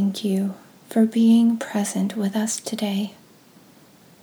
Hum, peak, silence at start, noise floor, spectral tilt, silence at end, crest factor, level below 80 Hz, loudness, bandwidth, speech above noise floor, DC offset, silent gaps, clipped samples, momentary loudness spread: none; -8 dBFS; 0 s; -51 dBFS; -5.5 dB/octave; 1.1 s; 16 dB; -78 dBFS; -22 LUFS; 19.5 kHz; 30 dB; under 0.1%; none; under 0.1%; 12 LU